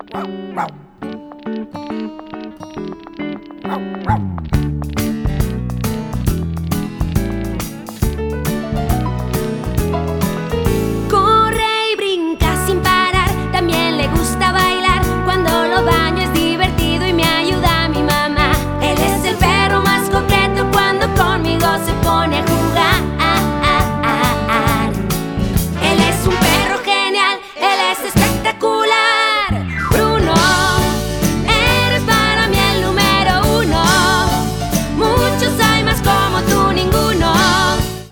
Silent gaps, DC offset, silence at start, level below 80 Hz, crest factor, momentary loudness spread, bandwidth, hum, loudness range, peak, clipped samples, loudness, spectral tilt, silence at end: none; under 0.1%; 0.1 s; -26 dBFS; 14 dB; 11 LU; over 20 kHz; none; 7 LU; -2 dBFS; under 0.1%; -15 LUFS; -4.5 dB/octave; 0 s